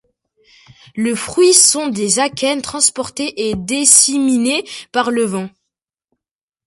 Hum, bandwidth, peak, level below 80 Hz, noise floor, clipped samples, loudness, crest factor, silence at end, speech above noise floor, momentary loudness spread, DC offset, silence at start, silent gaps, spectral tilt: none; 16 kHz; 0 dBFS; -52 dBFS; -84 dBFS; under 0.1%; -13 LUFS; 16 dB; 1.2 s; 68 dB; 14 LU; under 0.1%; 0.95 s; none; -2 dB/octave